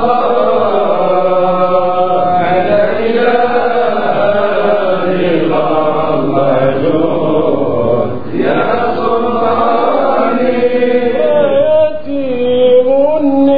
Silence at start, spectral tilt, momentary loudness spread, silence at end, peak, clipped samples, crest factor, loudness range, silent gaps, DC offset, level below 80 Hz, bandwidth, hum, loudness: 0 s; -9.5 dB/octave; 3 LU; 0 s; 0 dBFS; under 0.1%; 12 dB; 2 LU; none; 9%; -48 dBFS; 5 kHz; none; -12 LUFS